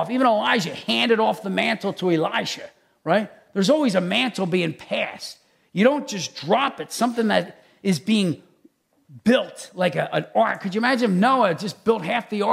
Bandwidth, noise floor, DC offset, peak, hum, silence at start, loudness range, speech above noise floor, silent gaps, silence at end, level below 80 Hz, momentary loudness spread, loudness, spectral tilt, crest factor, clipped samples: 15 kHz; -59 dBFS; under 0.1%; -4 dBFS; none; 0 s; 2 LU; 37 dB; none; 0 s; -70 dBFS; 10 LU; -22 LUFS; -5 dB/octave; 18 dB; under 0.1%